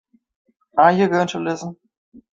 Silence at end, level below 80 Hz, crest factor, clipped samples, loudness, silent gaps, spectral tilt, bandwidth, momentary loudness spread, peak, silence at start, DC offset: 0.65 s; -64 dBFS; 20 dB; under 0.1%; -18 LUFS; none; -6 dB/octave; 7.8 kHz; 14 LU; -2 dBFS; 0.75 s; under 0.1%